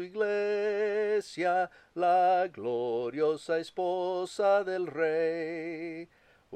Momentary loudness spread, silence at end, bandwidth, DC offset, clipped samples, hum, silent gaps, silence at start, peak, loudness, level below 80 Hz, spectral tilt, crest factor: 9 LU; 0 s; 10 kHz; under 0.1%; under 0.1%; none; none; 0 s; -16 dBFS; -30 LUFS; -76 dBFS; -5 dB/octave; 14 dB